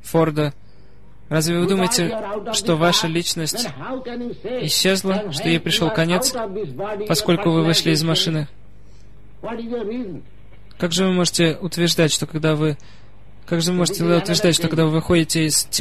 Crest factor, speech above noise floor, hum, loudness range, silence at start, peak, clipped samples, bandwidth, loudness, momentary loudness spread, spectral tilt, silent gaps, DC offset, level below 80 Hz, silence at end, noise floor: 16 dB; 29 dB; none; 3 LU; 0.05 s; -4 dBFS; under 0.1%; 14 kHz; -19 LUFS; 11 LU; -4 dB/octave; none; 2%; -48 dBFS; 0 s; -48 dBFS